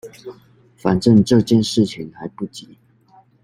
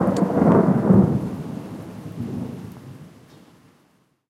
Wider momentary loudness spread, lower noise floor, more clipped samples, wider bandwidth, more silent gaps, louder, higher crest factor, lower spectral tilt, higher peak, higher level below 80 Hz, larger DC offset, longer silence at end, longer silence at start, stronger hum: first, 24 LU vs 21 LU; second, -52 dBFS vs -62 dBFS; neither; about the same, 12.5 kHz vs 12 kHz; neither; first, -16 LUFS vs -19 LUFS; about the same, 16 dB vs 18 dB; second, -6.5 dB/octave vs -9.5 dB/octave; about the same, -2 dBFS vs -4 dBFS; about the same, -52 dBFS vs -48 dBFS; neither; second, 0.85 s vs 1.2 s; about the same, 0.05 s vs 0 s; neither